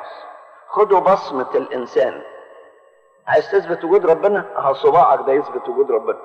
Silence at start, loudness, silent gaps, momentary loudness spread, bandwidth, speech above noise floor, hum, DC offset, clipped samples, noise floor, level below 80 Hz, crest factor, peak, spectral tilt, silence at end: 0 s; -17 LUFS; none; 10 LU; 6.6 kHz; 36 dB; none; under 0.1%; under 0.1%; -52 dBFS; -62 dBFS; 14 dB; -2 dBFS; -6.5 dB/octave; 0 s